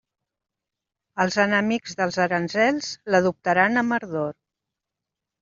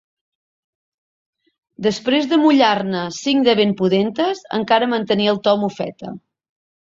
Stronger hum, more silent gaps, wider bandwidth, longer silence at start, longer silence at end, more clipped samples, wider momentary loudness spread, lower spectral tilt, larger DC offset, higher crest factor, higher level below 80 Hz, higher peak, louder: neither; neither; about the same, 7.6 kHz vs 7.8 kHz; second, 1.15 s vs 1.8 s; first, 1.1 s vs 0.75 s; neither; about the same, 9 LU vs 11 LU; second, -3.5 dB/octave vs -5.5 dB/octave; neither; about the same, 20 dB vs 18 dB; about the same, -66 dBFS vs -62 dBFS; about the same, -4 dBFS vs -2 dBFS; second, -22 LUFS vs -17 LUFS